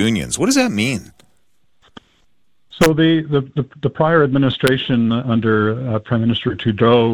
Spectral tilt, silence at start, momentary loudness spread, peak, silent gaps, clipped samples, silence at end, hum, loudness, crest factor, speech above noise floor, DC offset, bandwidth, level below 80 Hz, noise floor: -5.5 dB/octave; 0 s; 7 LU; 0 dBFS; none; under 0.1%; 0 s; none; -17 LUFS; 16 dB; 50 dB; under 0.1%; 17.5 kHz; -46 dBFS; -66 dBFS